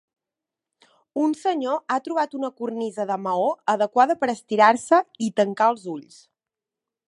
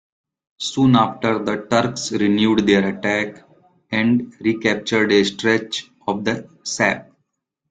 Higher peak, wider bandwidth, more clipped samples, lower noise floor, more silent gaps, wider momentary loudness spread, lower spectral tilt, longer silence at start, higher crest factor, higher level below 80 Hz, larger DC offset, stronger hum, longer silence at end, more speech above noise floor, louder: about the same, -2 dBFS vs -2 dBFS; first, 11.5 kHz vs 9.4 kHz; neither; first, -89 dBFS vs -74 dBFS; neither; about the same, 11 LU vs 11 LU; about the same, -5 dB/octave vs -5 dB/octave; first, 1.15 s vs 0.6 s; about the same, 22 dB vs 18 dB; second, -76 dBFS vs -56 dBFS; neither; neither; first, 1.05 s vs 0.7 s; first, 66 dB vs 55 dB; second, -22 LUFS vs -19 LUFS